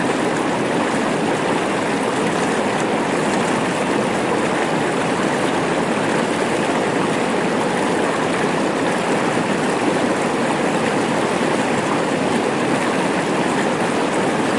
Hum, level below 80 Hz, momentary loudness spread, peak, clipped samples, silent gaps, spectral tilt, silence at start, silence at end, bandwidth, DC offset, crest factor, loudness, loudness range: none; -56 dBFS; 1 LU; -4 dBFS; under 0.1%; none; -4.5 dB/octave; 0 s; 0 s; 11.5 kHz; 0.1%; 14 dB; -19 LUFS; 0 LU